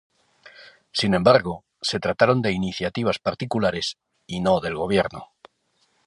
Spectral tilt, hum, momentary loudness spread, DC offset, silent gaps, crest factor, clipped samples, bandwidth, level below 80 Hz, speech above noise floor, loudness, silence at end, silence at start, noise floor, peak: -5.5 dB/octave; none; 11 LU; under 0.1%; none; 22 dB; under 0.1%; 11.5 kHz; -52 dBFS; 46 dB; -22 LUFS; 0.85 s; 0.45 s; -68 dBFS; -2 dBFS